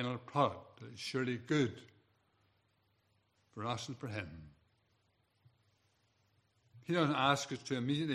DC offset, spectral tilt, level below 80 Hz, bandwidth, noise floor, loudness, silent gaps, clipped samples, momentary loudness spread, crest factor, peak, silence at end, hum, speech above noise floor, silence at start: under 0.1%; -5.5 dB/octave; -76 dBFS; 13.5 kHz; -77 dBFS; -36 LUFS; none; under 0.1%; 20 LU; 24 dB; -16 dBFS; 0 s; none; 40 dB; 0 s